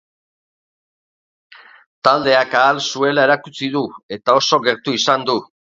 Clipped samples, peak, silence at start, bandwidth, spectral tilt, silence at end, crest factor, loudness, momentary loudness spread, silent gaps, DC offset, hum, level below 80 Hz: under 0.1%; 0 dBFS; 2.05 s; 7.8 kHz; -3.5 dB/octave; 0.3 s; 18 dB; -16 LUFS; 9 LU; 4.03-4.09 s; under 0.1%; none; -64 dBFS